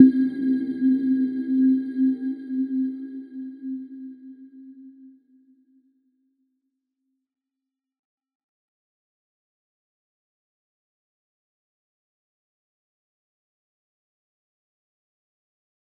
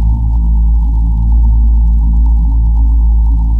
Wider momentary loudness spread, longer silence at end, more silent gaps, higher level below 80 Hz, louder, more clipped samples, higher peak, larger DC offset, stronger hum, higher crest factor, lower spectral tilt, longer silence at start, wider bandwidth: first, 24 LU vs 2 LU; first, 10.9 s vs 0 s; neither; second, -82 dBFS vs -8 dBFS; second, -24 LUFS vs -12 LUFS; neither; about the same, -2 dBFS vs -2 dBFS; neither; neither; first, 26 dB vs 6 dB; second, -9 dB/octave vs -11.5 dB/octave; about the same, 0 s vs 0 s; first, 4.2 kHz vs 1.1 kHz